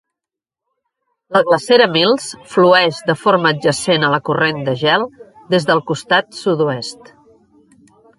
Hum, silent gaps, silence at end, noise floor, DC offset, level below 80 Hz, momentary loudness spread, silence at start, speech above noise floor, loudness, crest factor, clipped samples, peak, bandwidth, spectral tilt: none; none; 1.25 s; -85 dBFS; under 0.1%; -60 dBFS; 8 LU; 1.3 s; 71 dB; -15 LUFS; 16 dB; under 0.1%; 0 dBFS; 11.5 kHz; -4.5 dB/octave